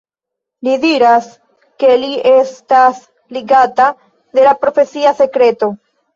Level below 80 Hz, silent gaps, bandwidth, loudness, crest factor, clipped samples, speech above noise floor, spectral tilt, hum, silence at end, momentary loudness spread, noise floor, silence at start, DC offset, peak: -60 dBFS; none; 7.4 kHz; -12 LUFS; 12 dB; under 0.1%; 70 dB; -4.5 dB/octave; none; 0.4 s; 9 LU; -81 dBFS; 0.65 s; under 0.1%; 0 dBFS